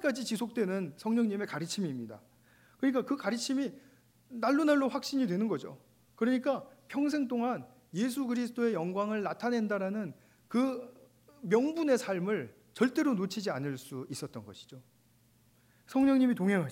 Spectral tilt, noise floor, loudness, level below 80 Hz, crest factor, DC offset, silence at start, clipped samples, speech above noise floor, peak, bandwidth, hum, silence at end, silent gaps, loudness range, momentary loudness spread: -5.5 dB/octave; -66 dBFS; -32 LUFS; -76 dBFS; 18 dB; under 0.1%; 0 s; under 0.1%; 35 dB; -14 dBFS; 16 kHz; 60 Hz at -55 dBFS; 0 s; none; 3 LU; 13 LU